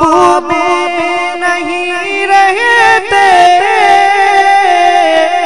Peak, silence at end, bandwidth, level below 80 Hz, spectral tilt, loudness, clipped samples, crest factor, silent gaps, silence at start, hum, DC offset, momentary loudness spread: 0 dBFS; 0 s; 12 kHz; -44 dBFS; -2.5 dB/octave; -8 LUFS; 2%; 8 dB; none; 0 s; none; 2%; 7 LU